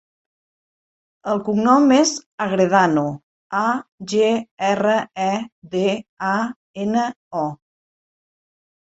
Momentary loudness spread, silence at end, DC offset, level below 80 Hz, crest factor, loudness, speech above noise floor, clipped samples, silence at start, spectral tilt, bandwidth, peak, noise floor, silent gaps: 12 LU; 1.25 s; under 0.1%; -64 dBFS; 18 dB; -20 LUFS; over 71 dB; under 0.1%; 1.25 s; -4.5 dB/octave; 8.2 kHz; -2 dBFS; under -90 dBFS; 2.26-2.38 s, 3.23-3.50 s, 3.92-3.98 s, 4.51-4.57 s, 5.52-5.62 s, 6.09-6.17 s, 6.56-6.74 s, 7.16-7.31 s